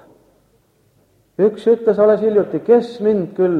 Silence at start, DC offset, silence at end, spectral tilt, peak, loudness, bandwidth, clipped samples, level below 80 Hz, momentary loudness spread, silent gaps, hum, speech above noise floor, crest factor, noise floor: 1.4 s; under 0.1%; 0 s; -8.5 dB/octave; -2 dBFS; -16 LUFS; 5.4 kHz; under 0.1%; -62 dBFS; 5 LU; none; none; 43 dB; 16 dB; -58 dBFS